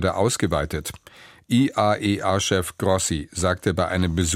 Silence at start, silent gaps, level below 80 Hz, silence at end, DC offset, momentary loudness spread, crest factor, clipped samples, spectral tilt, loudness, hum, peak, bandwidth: 0 s; none; -42 dBFS; 0 s; under 0.1%; 4 LU; 18 dB; under 0.1%; -4.5 dB/octave; -22 LUFS; none; -6 dBFS; 16 kHz